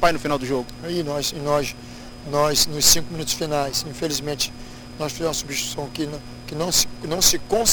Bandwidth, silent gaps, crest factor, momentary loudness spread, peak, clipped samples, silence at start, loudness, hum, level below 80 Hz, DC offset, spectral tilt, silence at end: over 20 kHz; none; 22 dB; 14 LU; 0 dBFS; under 0.1%; 0 s; -21 LUFS; none; -40 dBFS; under 0.1%; -2.5 dB/octave; 0 s